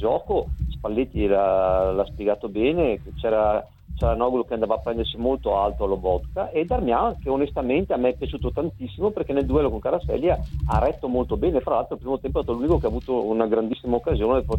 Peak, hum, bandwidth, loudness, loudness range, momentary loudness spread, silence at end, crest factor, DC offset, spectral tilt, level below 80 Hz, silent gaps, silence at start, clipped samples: -6 dBFS; none; 16.5 kHz; -24 LUFS; 2 LU; 6 LU; 0 s; 16 dB; under 0.1%; -9 dB/octave; -34 dBFS; none; 0 s; under 0.1%